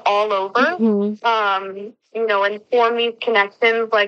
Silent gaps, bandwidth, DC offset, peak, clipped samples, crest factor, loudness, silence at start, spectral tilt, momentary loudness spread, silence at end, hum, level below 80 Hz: none; 6.8 kHz; under 0.1%; -2 dBFS; under 0.1%; 16 dB; -18 LUFS; 0.05 s; -5 dB/octave; 8 LU; 0 s; none; -80 dBFS